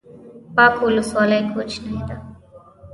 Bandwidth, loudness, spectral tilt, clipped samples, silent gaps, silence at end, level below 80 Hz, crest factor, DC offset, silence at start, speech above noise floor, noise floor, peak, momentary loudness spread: 11.5 kHz; -18 LUFS; -5.5 dB/octave; under 0.1%; none; 0 s; -46 dBFS; 18 dB; under 0.1%; 0.1 s; 28 dB; -46 dBFS; -2 dBFS; 15 LU